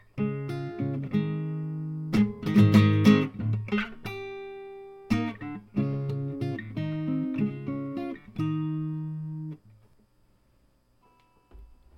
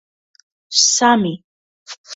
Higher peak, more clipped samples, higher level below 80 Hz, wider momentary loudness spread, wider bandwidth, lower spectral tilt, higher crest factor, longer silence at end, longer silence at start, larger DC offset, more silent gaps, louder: second, -6 dBFS vs 0 dBFS; neither; first, -56 dBFS vs -64 dBFS; second, 18 LU vs 24 LU; first, 13.5 kHz vs 8 kHz; first, -8 dB/octave vs -2 dB/octave; about the same, 22 dB vs 20 dB; first, 0.3 s vs 0 s; second, 0.15 s vs 0.7 s; neither; second, none vs 1.44-1.86 s, 1.98-2.04 s; second, -28 LUFS vs -14 LUFS